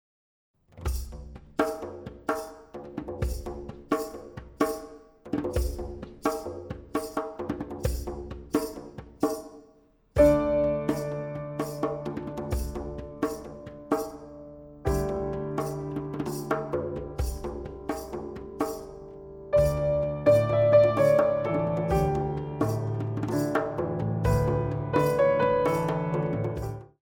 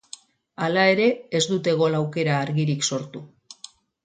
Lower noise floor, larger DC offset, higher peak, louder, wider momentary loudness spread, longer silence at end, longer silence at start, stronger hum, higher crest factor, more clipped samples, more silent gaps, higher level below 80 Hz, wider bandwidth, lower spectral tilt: first, -60 dBFS vs -48 dBFS; neither; second, -8 dBFS vs -4 dBFS; second, -28 LUFS vs -22 LUFS; second, 17 LU vs 23 LU; second, 0.2 s vs 0.5 s; first, 0.75 s vs 0.6 s; neither; about the same, 20 dB vs 18 dB; neither; neither; first, -40 dBFS vs -68 dBFS; first, over 20 kHz vs 9.6 kHz; first, -7 dB/octave vs -4.5 dB/octave